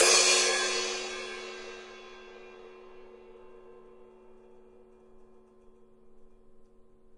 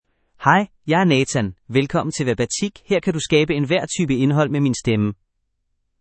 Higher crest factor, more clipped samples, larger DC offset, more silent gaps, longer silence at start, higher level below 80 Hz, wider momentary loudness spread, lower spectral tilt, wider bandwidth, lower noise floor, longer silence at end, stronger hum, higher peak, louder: first, 26 dB vs 20 dB; neither; neither; neither; second, 0 s vs 0.4 s; second, -64 dBFS vs -50 dBFS; first, 30 LU vs 5 LU; second, 1.5 dB/octave vs -5.5 dB/octave; first, 11.5 kHz vs 8.8 kHz; second, -56 dBFS vs -72 dBFS; second, 0.5 s vs 0.9 s; neither; second, -8 dBFS vs 0 dBFS; second, -26 LUFS vs -19 LUFS